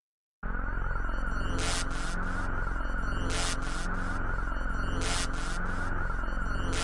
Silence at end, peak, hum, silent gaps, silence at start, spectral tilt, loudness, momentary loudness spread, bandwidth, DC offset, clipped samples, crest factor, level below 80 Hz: 0 s; -16 dBFS; none; none; 0.45 s; -4 dB/octave; -34 LUFS; 4 LU; 11.5 kHz; under 0.1%; under 0.1%; 12 dB; -32 dBFS